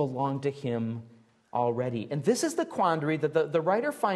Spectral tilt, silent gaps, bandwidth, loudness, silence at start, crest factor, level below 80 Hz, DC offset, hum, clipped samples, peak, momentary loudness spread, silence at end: -6 dB/octave; none; 12.5 kHz; -29 LUFS; 0 s; 16 dB; -74 dBFS; under 0.1%; none; under 0.1%; -12 dBFS; 6 LU; 0 s